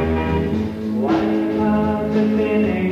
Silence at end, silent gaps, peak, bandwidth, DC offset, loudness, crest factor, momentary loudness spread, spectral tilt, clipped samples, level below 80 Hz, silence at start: 0 s; none; -6 dBFS; 7 kHz; under 0.1%; -19 LUFS; 12 dB; 4 LU; -8.5 dB/octave; under 0.1%; -36 dBFS; 0 s